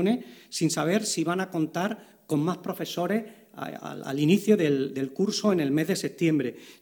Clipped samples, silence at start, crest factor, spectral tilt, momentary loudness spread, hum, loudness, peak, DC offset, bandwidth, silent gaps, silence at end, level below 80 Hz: under 0.1%; 0 s; 18 dB; -5 dB/octave; 13 LU; none; -27 LUFS; -8 dBFS; under 0.1%; over 20 kHz; none; 0.05 s; -72 dBFS